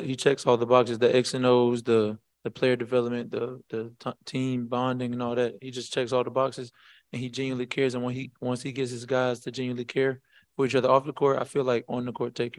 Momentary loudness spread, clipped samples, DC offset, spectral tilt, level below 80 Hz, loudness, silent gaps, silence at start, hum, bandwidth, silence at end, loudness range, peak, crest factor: 13 LU; under 0.1%; under 0.1%; -5.5 dB/octave; -72 dBFS; -27 LUFS; none; 0 s; none; 12 kHz; 0.1 s; 6 LU; -6 dBFS; 22 dB